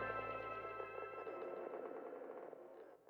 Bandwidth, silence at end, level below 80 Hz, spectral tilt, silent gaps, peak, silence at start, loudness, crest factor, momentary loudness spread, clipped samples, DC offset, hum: over 20 kHz; 0 s; -76 dBFS; -7 dB/octave; none; -30 dBFS; 0 s; -49 LUFS; 18 dB; 9 LU; under 0.1%; under 0.1%; none